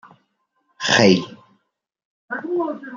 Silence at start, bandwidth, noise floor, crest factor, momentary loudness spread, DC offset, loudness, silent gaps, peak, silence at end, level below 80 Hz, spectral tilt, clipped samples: 0.8 s; 7.6 kHz; -73 dBFS; 22 dB; 17 LU; under 0.1%; -18 LUFS; 2.05-2.28 s; 0 dBFS; 0 s; -60 dBFS; -4 dB/octave; under 0.1%